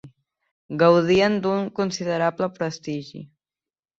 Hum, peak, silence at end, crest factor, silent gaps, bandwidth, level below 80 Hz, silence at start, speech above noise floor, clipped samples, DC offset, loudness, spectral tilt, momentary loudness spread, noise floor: none; -4 dBFS; 0.75 s; 18 dB; 0.51-0.69 s; 7.8 kHz; -60 dBFS; 0.05 s; over 69 dB; under 0.1%; under 0.1%; -22 LUFS; -6 dB/octave; 16 LU; under -90 dBFS